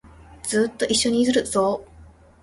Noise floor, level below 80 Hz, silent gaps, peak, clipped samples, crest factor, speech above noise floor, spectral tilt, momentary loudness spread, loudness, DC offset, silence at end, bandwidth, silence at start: -48 dBFS; -50 dBFS; none; -8 dBFS; under 0.1%; 16 dB; 27 dB; -3 dB/octave; 9 LU; -21 LUFS; under 0.1%; 0.4 s; 11.5 kHz; 0.05 s